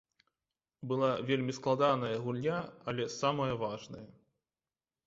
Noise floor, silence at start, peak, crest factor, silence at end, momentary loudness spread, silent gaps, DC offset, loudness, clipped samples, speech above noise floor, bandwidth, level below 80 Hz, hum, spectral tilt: under -90 dBFS; 0.8 s; -16 dBFS; 20 dB; 0.95 s; 13 LU; none; under 0.1%; -33 LUFS; under 0.1%; over 57 dB; 7.6 kHz; -70 dBFS; none; -5 dB/octave